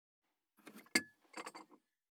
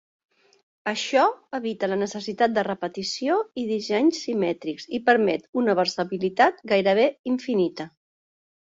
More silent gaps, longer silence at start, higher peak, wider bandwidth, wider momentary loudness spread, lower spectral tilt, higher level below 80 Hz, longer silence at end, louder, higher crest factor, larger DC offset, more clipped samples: second, none vs 5.49-5.53 s, 7.19-7.24 s; second, 0.65 s vs 0.85 s; second, -16 dBFS vs -4 dBFS; first, 19.5 kHz vs 8 kHz; first, 22 LU vs 9 LU; second, -1 dB/octave vs -4.5 dB/octave; second, under -90 dBFS vs -68 dBFS; second, 0.45 s vs 0.75 s; second, -41 LUFS vs -24 LUFS; first, 32 dB vs 20 dB; neither; neither